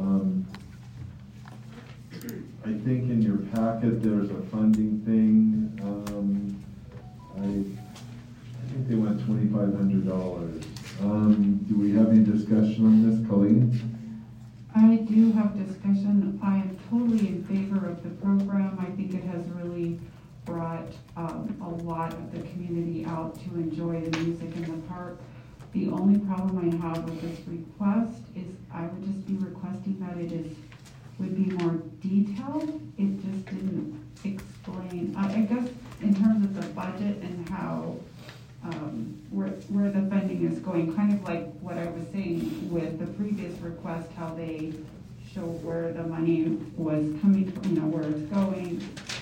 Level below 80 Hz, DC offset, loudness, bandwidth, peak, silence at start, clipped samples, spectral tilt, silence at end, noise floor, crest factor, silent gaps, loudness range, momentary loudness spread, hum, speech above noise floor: -56 dBFS; under 0.1%; -27 LUFS; 9 kHz; -8 dBFS; 0 s; under 0.1%; -8.5 dB/octave; 0 s; -47 dBFS; 18 dB; none; 11 LU; 19 LU; none; 19 dB